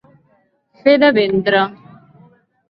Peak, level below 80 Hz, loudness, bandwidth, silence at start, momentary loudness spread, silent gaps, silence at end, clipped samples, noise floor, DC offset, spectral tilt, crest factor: 0 dBFS; -60 dBFS; -14 LUFS; 5.6 kHz; 0.85 s; 7 LU; none; 0.95 s; under 0.1%; -59 dBFS; under 0.1%; -9 dB/octave; 18 dB